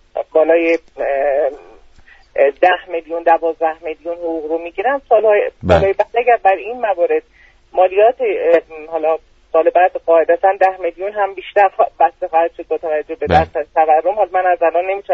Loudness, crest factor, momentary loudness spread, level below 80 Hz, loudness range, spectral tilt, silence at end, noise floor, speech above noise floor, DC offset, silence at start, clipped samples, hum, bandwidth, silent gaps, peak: -15 LUFS; 16 dB; 9 LU; -42 dBFS; 3 LU; -7 dB/octave; 0 s; -45 dBFS; 30 dB; under 0.1%; 0.15 s; under 0.1%; none; 7.4 kHz; none; 0 dBFS